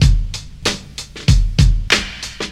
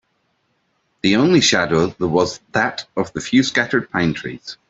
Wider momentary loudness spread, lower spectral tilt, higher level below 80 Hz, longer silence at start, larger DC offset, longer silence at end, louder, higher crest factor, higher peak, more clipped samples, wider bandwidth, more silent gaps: about the same, 13 LU vs 11 LU; about the same, -4.5 dB/octave vs -4 dB/octave; first, -18 dBFS vs -52 dBFS; second, 0 s vs 1.05 s; neither; second, 0 s vs 0.15 s; about the same, -17 LUFS vs -18 LUFS; about the same, 16 dB vs 18 dB; about the same, 0 dBFS vs -2 dBFS; neither; first, 13 kHz vs 8.2 kHz; neither